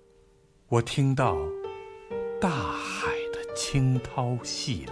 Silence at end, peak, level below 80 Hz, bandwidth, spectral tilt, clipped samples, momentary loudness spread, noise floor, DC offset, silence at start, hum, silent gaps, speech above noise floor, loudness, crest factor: 0 s; -8 dBFS; -50 dBFS; 11 kHz; -5.5 dB/octave; under 0.1%; 10 LU; -60 dBFS; under 0.1%; 0.7 s; none; none; 33 dB; -28 LUFS; 20 dB